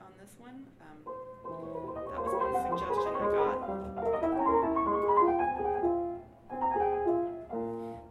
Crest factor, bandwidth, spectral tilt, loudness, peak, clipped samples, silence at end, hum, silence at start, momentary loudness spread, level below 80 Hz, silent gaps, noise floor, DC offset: 18 dB; 12.5 kHz; -7.5 dB/octave; -31 LUFS; -14 dBFS; under 0.1%; 0 s; none; 0 s; 17 LU; -56 dBFS; none; -52 dBFS; under 0.1%